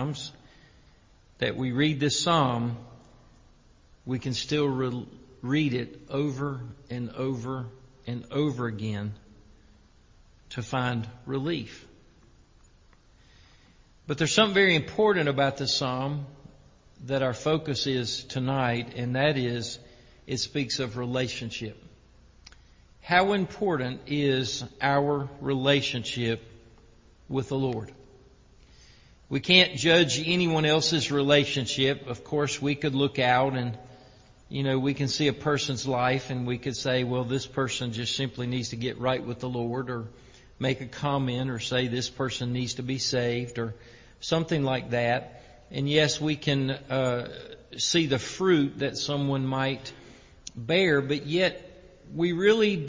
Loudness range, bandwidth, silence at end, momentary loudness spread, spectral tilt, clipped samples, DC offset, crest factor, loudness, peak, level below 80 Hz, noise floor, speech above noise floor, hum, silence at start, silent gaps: 9 LU; 7.6 kHz; 0 s; 14 LU; -4.5 dB/octave; under 0.1%; under 0.1%; 26 dB; -27 LUFS; -2 dBFS; -56 dBFS; -58 dBFS; 31 dB; none; 0 s; none